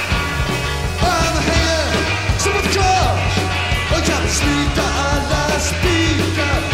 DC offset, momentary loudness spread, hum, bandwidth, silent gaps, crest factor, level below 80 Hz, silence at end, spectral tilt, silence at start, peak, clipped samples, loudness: 0.8%; 3 LU; none; 16 kHz; none; 14 dB; -24 dBFS; 0 s; -4 dB/octave; 0 s; -2 dBFS; under 0.1%; -17 LUFS